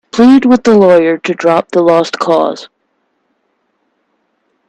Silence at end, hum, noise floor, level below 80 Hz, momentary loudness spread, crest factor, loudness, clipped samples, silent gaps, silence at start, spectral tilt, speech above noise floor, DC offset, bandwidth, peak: 2.05 s; none; -63 dBFS; -52 dBFS; 7 LU; 12 dB; -9 LUFS; under 0.1%; none; 0.15 s; -6 dB/octave; 54 dB; under 0.1%; 8.8 kHz; 0 dBFS